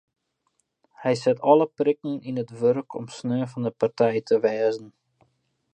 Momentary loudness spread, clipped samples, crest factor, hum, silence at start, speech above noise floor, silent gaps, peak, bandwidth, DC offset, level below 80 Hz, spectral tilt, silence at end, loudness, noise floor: 11 LU; under 0.1%; 22 dB; none; 1 s; 50 dB; none; -4 dBFS; 9 kHz; under 0.1%; -74 dBFS; -7 dB/octave; 0.85 s; -24 LUFS; -74 dBFS